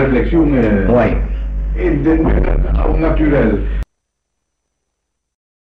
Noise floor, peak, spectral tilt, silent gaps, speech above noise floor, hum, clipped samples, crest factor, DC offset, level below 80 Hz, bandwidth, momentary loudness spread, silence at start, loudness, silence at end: -73 dBFS; -2 dBFS; -10 dB/octave; none; 61 dB; none; under 0.1%; 12 dB; under 0.1%; -18 dBFS; 4.3 kHz; 10 LU; 0 s; -15 LUFS; 1.8 s